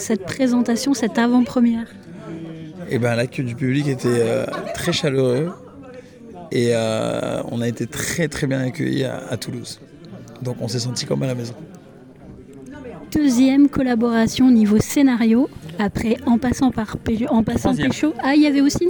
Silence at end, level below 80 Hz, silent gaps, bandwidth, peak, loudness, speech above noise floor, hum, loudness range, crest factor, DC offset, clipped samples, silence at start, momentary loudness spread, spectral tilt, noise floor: 0 s; -46 dBFS; none; 19.5 kHz; -6 dBFS; -19 LUFS; 24 dB; none; 9 LU; 14 dB; under 0.1%; under 0.1%; 0 s; 20 LU; -5.5 dB/octave; -43 dBFS